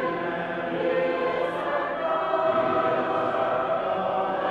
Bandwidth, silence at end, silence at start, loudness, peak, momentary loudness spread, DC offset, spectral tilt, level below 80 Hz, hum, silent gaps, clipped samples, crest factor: 7.6 kHz; 0 s; 0 s; -25 LUFS; -12 dBFS; 4 LU; under 0.1%; -7 dB/octave; -62 dBFS; none; none; under 0.1%; 12 dB